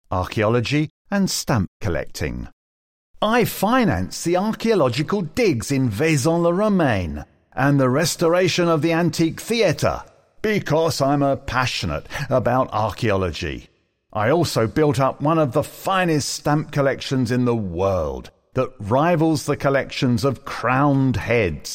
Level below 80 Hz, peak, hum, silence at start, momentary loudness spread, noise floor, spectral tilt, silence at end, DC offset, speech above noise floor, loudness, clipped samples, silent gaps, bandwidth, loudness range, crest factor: -42 dBFS; -4 dBFS; none; 0.1 s; 8 LU; under -90 dBFS; -5.5 dB/octave; 0 s; under 0.1%; over 70 dB; -20 LUFS; under 0.1%; 0.90-1.05 s, 1.68-1.80 s, 2.53-3.14 s; 16.5 kHz; 3 LU; 16 dB